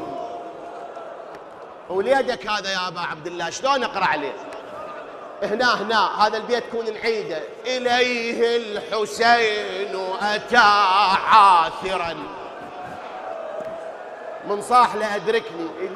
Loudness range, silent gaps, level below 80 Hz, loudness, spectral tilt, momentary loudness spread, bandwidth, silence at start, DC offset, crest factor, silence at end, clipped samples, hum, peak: 8 LU; none; -60 dBFS; -20 LUFS; -3 dB/octave; 19 LU; 14 kHz; 0 s; under 0.1%; 20 dB; 0 s; under 0.1%; none; -2 dBFS